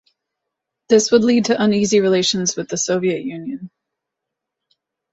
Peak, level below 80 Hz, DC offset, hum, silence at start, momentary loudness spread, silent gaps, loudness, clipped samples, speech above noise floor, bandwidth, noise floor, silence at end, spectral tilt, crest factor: -2 dBFS; -60 dBFS; under 0.1%; none; 0.9 s; 14 LU; none; -17 LUFS; under 0.1%; 65 dB; 8 kHz; -82 dBFS; 1.45 s; -4 dB/octave; 18 dB